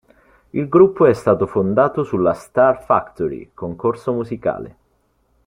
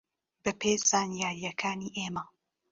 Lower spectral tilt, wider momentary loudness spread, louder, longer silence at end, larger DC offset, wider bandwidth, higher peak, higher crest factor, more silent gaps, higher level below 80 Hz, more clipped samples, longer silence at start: first, -8.5 dB/octave vs -3 dB/octave; about the same, 13 LU vs 11 LU; first, -18 LUFS vs -30 LUFS; first, 0.75 s vs 0.45 s; neither; first, 11 kHz vs 7.6 kHz; first, -2 dBFS vs -12 dBFS; about the same, 16 dB vs 20 dB; neither; first, -52 dBFS vs -68 dBFS; neither; about the same, 0.55 s vs 0.45 s